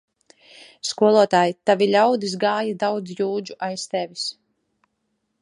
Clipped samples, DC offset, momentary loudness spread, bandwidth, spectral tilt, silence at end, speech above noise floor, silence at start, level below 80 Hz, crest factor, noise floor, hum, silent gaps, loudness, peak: under 0.1%; under 0.1%; 12 LU; 11 kHz; -4.5 dB/octave; 1.1 s; 53 dB; 0.6 s; -74 dBFS; 20 dB; -74 dBFS; none; none; -21 LUFS; -4 dBFS